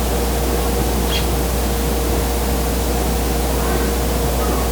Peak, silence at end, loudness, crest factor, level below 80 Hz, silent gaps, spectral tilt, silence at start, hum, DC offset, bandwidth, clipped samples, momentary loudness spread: -6 dBFS; 0 s; -19 LUFS; 12 dB; -20 dBFS; none; -4.5 dB/octave; 0 s; none; under 0.1%; over 20 kHz; under 0.1%; 1 LU